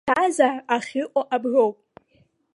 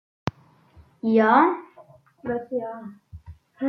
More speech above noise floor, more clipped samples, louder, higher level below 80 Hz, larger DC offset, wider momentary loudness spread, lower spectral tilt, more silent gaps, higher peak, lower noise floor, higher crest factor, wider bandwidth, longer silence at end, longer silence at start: first, 41 dB vs 33 dB; neither; about the same, -22 LUFS vs -23 LUFS; second, -68 dBFS vs -58 dBFS; neither; second, 6 LU vs 19 LU; second, -3.5 dB/octave vs -8 dB/octave; neither; about the same, -4 dBFS vs -4 dBFS; first, -63 dBFS vs -54 dBFS; about the same, 20 dB vs 20 dB; first, 11.5 kHz vs 6.4 kHz; first, 0.8 s vs 0 s; second, 0.05 s vs 0.25 s